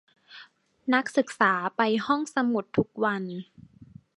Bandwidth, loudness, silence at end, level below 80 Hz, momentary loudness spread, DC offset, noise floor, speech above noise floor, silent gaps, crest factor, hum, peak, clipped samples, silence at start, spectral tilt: 11.5 kHz; -26 LUFS; 0.3 s; -64 dBFS; 10 LU; under 0.1%; -53 dBFS; 27 dB; none; 22 dB; none; -6 dBFS; under 0.1%; 0.3 s; -5.5 dB/octave